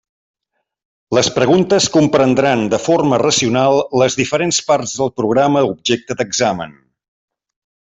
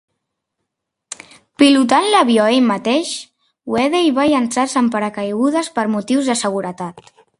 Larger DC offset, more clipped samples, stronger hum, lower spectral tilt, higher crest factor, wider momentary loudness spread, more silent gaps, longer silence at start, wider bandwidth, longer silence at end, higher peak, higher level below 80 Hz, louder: neither; neither; neither; about the same, -4 dB/octave vs -4 dB/octave; about the same, 14 dB vs 16 dB; second, 6 LU vs 17 LU; neither; about the same, 1.1 s vs 1.1 s; second, 8.4 kHz vs 11.5 kHz; first, 1.15 s vs 0.4 s; about the same, 0 dBFS vs 0 dBFS; first, -52 dBFS vs -60 dBFS; about the same, -14 LUFS vs -16 LUFS